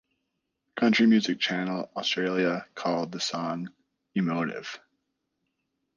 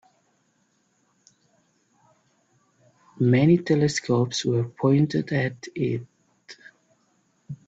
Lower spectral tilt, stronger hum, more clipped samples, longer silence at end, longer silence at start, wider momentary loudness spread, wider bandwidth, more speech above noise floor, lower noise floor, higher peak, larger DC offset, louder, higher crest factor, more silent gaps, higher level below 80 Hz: second, -5 dB/octave vs -6.5 dB/octave; neither; neither; first, 1.2 s vs 0.15 s; second, 0.75 s vs 3.15 s; second, 16 LU vs 19 LU; second, 7.4 kHz vs 8.2 kHz; first, 54 dB vs 46 dB; first, -80 dBFS vs -68 dBFS; second, -12 dBFS vs -8 dBFS; neither; second, -27 LUFS vs -23 LUFS; about the same, 18 dB vs 18 dB; neither; second, -74 dBFS vs -62 dBFS